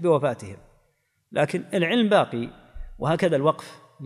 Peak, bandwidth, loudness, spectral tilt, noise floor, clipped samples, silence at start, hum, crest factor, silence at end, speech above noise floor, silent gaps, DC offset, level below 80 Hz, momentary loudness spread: -6 dBFS; 13.5 kHz; -24 LUFS; -6.5 dB/octave; -69 dBFS; under 0.1%; 0 s; none; 18 dB; 0 s; 46 dB; none; under 0.1%; -48 dBFS; 16 LU